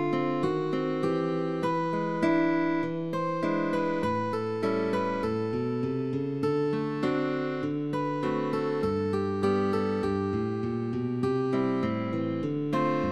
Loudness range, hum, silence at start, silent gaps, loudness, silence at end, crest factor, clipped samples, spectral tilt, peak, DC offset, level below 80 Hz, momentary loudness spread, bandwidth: 1 LU; none; 0 s; none; -29 LUFS; 0 s; 14 dB; under 0.1%; -8 dB/octave; -14 dBFS; 0.2%; -60 dBFS; 4 LU; 12 kHz